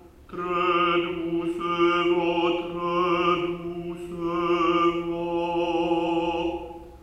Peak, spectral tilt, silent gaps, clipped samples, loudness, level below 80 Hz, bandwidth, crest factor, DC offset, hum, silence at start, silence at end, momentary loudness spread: -10 dBFS; -6.5 dB/octave; none; under 0.1%; -25 LUFS; -52 dBFS; 7 kHz; 14 dB; under 0.1%; none; 0.05 s; 0 s; 11 LU